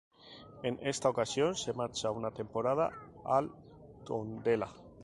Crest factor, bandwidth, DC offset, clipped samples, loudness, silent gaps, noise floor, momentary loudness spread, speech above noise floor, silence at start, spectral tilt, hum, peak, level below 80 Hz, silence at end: 20 dB; 11.5 kHz; under 0.1%; under 0.1%; -34 LUFS; none; -54 dBFS; 17 LU; 20 dB; 0.25 s; -4.5 dB/octave; none; -14 dBFS; -66 dBFS; 0 s